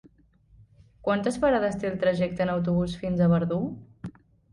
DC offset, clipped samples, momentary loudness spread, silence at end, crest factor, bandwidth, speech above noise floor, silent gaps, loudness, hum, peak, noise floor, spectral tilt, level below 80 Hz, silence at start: under 0.1%; under 0.1%; 16 LU; 0.45 s; 16 dB; 11.5 kHz; 34 dB; none; -26 LUFS; none; -12 dBFS; -59 dBFS; -7.5 dB/octave; -52 dBFS; 1.05 s